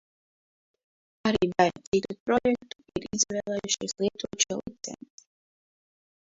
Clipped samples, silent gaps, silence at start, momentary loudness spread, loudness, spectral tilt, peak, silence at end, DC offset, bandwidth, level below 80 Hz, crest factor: under 0.1%; 1.87-1.92 s, 2.20-2.26 s; 1.25 s; 13 LU; -28 LUFS; -3 dB/octave; -8 dBFS; 1.4 s; under 0.1%; 8 kHz; -60 dBFS; 22 dB